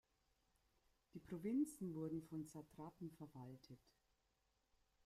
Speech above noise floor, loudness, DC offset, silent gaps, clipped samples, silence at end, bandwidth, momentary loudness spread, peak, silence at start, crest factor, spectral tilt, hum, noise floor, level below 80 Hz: 36 dB; -50 LUFS; under 0.1%; none; under 0.1%; 1.3 s; 15.5 kHz; 19 LU; -34 dBFS; 1.15 s; 18 dB; -7.5 dB/octave; none; -85 dBFS; -80 dBFS